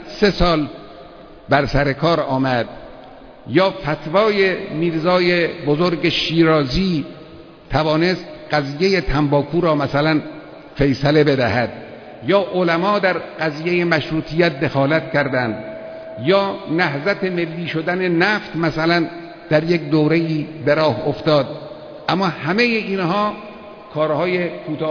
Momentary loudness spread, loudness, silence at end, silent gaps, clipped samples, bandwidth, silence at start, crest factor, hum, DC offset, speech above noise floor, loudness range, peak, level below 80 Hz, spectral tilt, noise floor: 13 LU; -18 LUFS; 0 s; none; under 0.1%; 5.4 kHz; 0 s; 18 dB; none; under 0.1%; 22 dB; 2 LU; -2 dBFS; -38 dBFS; -7 dB/octave; -40 dBFS